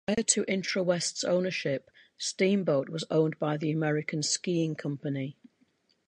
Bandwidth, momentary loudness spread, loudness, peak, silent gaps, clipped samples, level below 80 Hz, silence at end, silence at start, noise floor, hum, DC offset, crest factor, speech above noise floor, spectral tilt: 11 kHz; 9 LU; -29 LUFS; -10 dBFS; none; under 0.1%; -70 dBFS; 0.75 s; 0.1 s; -70 dBFS; none; under 0.1%; 20 dB; 41 dB; -4 dB/octave